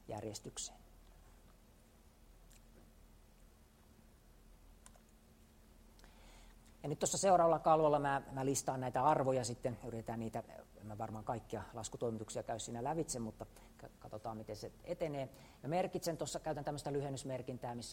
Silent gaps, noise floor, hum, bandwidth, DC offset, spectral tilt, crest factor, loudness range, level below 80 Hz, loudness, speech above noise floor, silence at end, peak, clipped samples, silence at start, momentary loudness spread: none; -65 dBFS; none; 16 kHz; under 0.1%; -5 dB/octave; 22 dB; 10 LU; -64 dBFS; -39 LUFS; 26 dB; 0 s; -18 dBFS; under 0.1%; 0.05 s; 18 LU